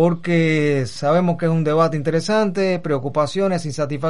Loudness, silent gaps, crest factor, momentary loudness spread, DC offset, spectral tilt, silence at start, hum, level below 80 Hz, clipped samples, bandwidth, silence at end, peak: -19 LUFS; none; 14 dB; 4 LU; 2%; -6.5 dB/octave; 0 s; none; -54 dBFS; under 0.1%; 11.5 kHz; 0 s; -4 dBFS